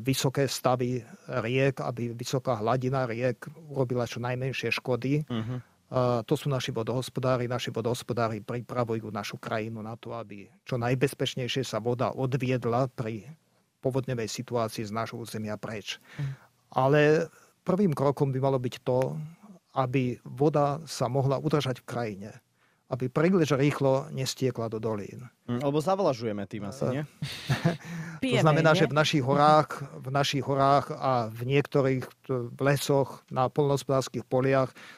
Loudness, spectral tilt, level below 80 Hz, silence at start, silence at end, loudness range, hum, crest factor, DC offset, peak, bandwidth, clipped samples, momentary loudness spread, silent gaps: -28 LUFS; -6 dB/octave; -62 dBFS; 0 s; 0 s; 7 LU; none; 22 dB; under 0.1%; -6 dBFS; 15.5 kHz; under 0.1%; 13 LU; none